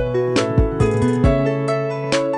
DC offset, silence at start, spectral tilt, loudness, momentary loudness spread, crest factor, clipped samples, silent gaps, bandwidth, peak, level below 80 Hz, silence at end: under 0.1%; 0 s; -6.5 dB/octave; -18 LUFS; 4 LU; 14 dB; under 0.1%; none; 11 kHz; -4 dBFS; -28 dBFS; 0 s